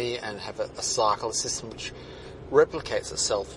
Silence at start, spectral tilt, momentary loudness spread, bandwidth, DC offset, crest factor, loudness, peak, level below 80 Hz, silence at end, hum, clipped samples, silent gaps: 0 s; -2.5 dB/octave; 14 LU; 11.5 kHz; under 0.1%; 22 dB; -27 LUFS; -6 dBFS; -52 dBFS; 0 s; none; under 0.1%; none